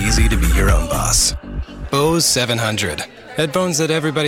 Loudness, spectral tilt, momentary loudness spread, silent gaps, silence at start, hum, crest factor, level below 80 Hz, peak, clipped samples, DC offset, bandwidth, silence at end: -17 LUFS; -3.5 dB/octave; 13 LU; none; 0 s; none; 14 dB; -22 dBFS; -4 dBFS; under 0.1%; under 0.1%; 17 kHz; 0 s